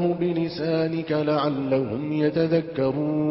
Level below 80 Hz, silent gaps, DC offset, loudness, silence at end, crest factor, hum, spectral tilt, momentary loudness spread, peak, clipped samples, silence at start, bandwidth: -58 dBFS; none; under 0.1%; -24 LUFS; 0 s; 14 dB; none; -11.5 dB/octave; 3 LU; -10 dBFS; under 0.1%; 0 s; 5.8 kHz